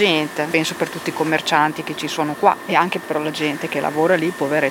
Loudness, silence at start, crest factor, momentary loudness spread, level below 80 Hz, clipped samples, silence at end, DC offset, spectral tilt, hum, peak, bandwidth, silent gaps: -19 LUFS; 0 s; 18 dB; 6 LU; -64 dBFS; under 0.1%; 0 s; under 0.1%; -4 dB/octave; none; 0 dBFS; 17 kHz; none